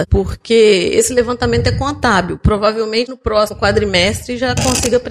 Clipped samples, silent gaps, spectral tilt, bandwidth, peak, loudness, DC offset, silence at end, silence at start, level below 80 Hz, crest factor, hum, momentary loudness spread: under 0.1%; none; -4 dB/octave; 15.5 kHz; -2 dBFS; -14 LUFS; under 0.1%; 0 s; 0 s; -26 dBFS; 12 dB; none; 6 LU